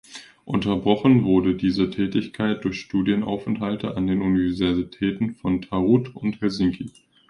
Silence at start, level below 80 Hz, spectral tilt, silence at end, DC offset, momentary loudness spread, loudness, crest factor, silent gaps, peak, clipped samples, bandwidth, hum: 0.1 s; -48 dBFS; -7.5 dB/octave; 0.4 s; under 0.1%; 8 LU; -23 LUFS; 18 dB; none; -4 dBFS; under 0.1%; 10.5 kHz; none